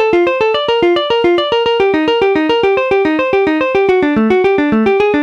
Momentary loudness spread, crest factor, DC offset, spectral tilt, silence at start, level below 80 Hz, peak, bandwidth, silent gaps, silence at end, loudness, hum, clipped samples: 1 LU; 8 dB; under 0.1%; -6 dB/octave; 0 s; -44 dBFS; -2 dBFS; 7.6 kHz; none; 0 s; -12 LUFS; none; under 0.1%